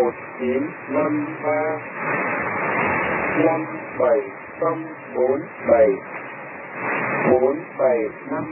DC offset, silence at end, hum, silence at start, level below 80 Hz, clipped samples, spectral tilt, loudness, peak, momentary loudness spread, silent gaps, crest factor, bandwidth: under 0.1%; 0 s; none; 0 s; -56 dBFS; under 0.1%; -11.5 dB/octave; -22 LUFS; -4 dBFS; 11 LU; none; 18 dB; 3.2 kHz